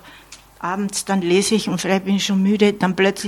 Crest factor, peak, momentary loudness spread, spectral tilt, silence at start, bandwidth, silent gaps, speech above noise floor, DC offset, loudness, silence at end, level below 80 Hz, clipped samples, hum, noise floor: 18 dB; -2 dBFS; 7 LU; -4.5 dB/octave; 0.05 s; 15 kHz; none; 26 dB; under 0.1%; -19 LUFS; 0 s; -56 dBFS; under 0.1%; none; -44 dBFS